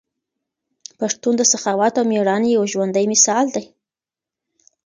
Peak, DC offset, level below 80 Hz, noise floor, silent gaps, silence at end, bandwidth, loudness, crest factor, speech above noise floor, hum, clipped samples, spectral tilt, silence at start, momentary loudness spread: 0 dBFS; under 0.1%; -70 dBFS; -89 dBFS; none; 1.2 s; 10 kHz; -17 LUFS; 20 dB; 72 dB; none; under 0.1%; -3 dB/octave; 1 s; 9 LU